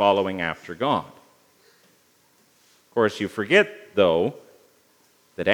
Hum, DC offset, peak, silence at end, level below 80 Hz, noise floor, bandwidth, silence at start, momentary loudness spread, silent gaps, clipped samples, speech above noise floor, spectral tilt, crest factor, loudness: none; under 0.1%; -2 dBFS; 0 s; -68 dBFS; -61 dBFS; 19.5 kHz; 0 s; 10 LU; none; under 0.1%; 39 dB; -5.5 dB/octave; 22 dB; -23 LUFS